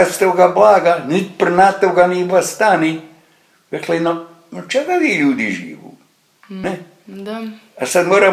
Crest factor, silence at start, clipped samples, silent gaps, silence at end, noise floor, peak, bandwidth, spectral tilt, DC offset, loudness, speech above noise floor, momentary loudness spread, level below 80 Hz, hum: 16 dB; 0 s; under 0.1%; none; 0 s; -54 dBFS; 0 dBFS; 15.5 kHz; -4.5 dB/octave; under 0.1%; -14 LUFS; 39 dB; 18 LU; -60 dBFS; none